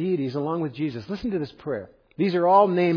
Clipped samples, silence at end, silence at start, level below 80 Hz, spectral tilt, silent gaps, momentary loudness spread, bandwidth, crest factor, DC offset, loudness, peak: under 0.1%; 0 s; 0 s; -58 dBFS; -9 dB/octave; none; 14 LU; 5.4 kHz; 18 dB; under 0.1%; -24 LUFS; -6 dBFS